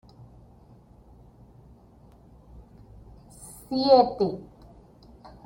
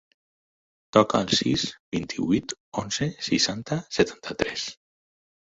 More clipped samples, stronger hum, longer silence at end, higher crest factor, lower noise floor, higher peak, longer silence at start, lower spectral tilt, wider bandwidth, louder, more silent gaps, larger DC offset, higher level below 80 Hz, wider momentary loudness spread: neither; neither; first, 1.05 s vs 0.75 s; about the same, 24 dB vs 24 dB; second, -53 dBFS vs under -90 dBFS; about the same, -6 dBFS vs -4 dBFS; first, 2.55 s vs 0.95 s; first, -6 dB/octave vs -4 dB/octave; first, 16.5 kHz vs 8 kHz; first, -22 LUFS vs -25 LUFS; second, none vs 1.80-1.92 s, 2.60-2.72 s; neither; about the same, -54 dBFS vs -54 dBFS; first, 26 LU vs 10 LU